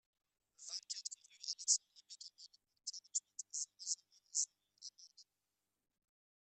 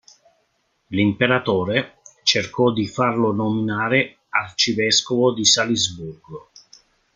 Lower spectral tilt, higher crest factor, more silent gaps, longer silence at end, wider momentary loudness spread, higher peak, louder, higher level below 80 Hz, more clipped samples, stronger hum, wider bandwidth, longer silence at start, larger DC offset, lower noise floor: second, 6.5 dB/octave vs -3.5 dB/octave; first, 30 dB vs 20 dB; neither; first, 1.2 s vs 0.75 s; first, 21 LU vs 14 LU; second, -18 dBFS vs -2 dBFS; second, -41 LUFS vs -19 LUFS; second, under -90 dBFS vs -58 dBFS; neither; neither; first, 13 kHz vs 10 kHz; second, 0.6 s vs 0.9 s; neither; first, under -90 dBFS vs -68 dBFS